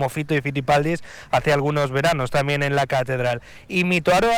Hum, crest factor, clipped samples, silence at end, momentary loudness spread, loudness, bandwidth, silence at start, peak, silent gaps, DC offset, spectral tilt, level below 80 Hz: none; 14 dB; under 0.1%; 0 s; 6 LU; -21 LUFS; 18 kHz; 0 s; -6 dBFS; none; 0.3%; -5.5 dB/octave; -44 dBFS